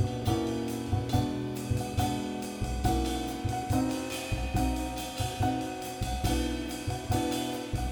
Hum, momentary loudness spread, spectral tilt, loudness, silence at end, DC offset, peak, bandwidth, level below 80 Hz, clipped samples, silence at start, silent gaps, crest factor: none; 5 LU; -5.5 dB/octave; -32 LUFS; 0 s; under 0.1%; -14 dBFS; over 20 kHz; -38 dBFS; under 0.1%; 0 s; none; 16 dB